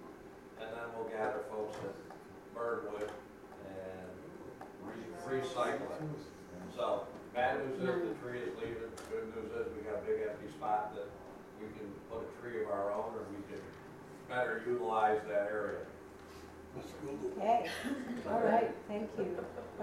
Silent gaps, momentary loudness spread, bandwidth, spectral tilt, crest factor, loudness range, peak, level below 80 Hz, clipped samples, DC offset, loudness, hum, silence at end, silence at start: none; 17 LU; 16 kHz; -6 dB/octave; 22 dB; 6 LU; -18 dBFS; -68 dBFS; under 0.1%; under 0.1%; -39 LUFS; none; 0 s; 0 s